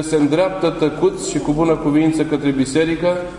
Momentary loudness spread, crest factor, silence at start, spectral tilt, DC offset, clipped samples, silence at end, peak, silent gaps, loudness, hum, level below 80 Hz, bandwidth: 3 LU; 12 dB; 0 s; -6 dB/octave; under 0.1%; under 0.1%; 0 s; -4 dBFS; none; -17 LUFS; none; -42 dBFS; 11 kHz